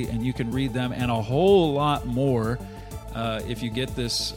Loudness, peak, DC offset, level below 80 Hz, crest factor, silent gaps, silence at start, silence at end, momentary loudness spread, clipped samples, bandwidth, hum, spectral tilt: -25 LUFS; -8 dBFS; under 0.1%; -40 dBFS; 16 dB; none; 0 s; 0 s; 12 LU; under 0.1%; 16.5 kHz; none; -6 dB/octave